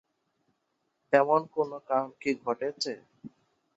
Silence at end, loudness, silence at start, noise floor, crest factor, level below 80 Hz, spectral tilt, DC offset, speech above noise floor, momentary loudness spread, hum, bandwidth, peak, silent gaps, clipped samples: 0.5 s; -29 LUFS; 1.1 s; -78 dBFS; 24 dB; -78 dBFS; -4.5 dB/octave; under 0.1%; 49 dB; 11 LU; none; 8.2 kHz; -8 dBFS; none; under 0.1%